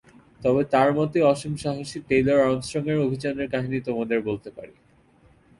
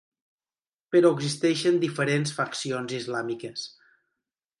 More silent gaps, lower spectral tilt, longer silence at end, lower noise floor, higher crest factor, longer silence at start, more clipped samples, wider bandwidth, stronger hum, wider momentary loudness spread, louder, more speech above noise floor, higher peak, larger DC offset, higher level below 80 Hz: neither; first, -6.5 dB/octave vs -5 dB/octave; about the same, 0.9 s vs 0.95 s; second, -57 dBFS vs under -90 dBFS; about the same, 16 dB vs 20 dB; second, 0.4 s vs 0.9 s; neither; about the same, 11.5 kHz vs 11.5 kHz; neither; about the same, 10 LU vs 12 LU; about the same, -24 LUFS vs -26 LUFS; second, 34 dB vs over 65 dB; about the same, -8 dBFS vs -8 dBFS; neither; first, -54 dBFS vs -74 dBFS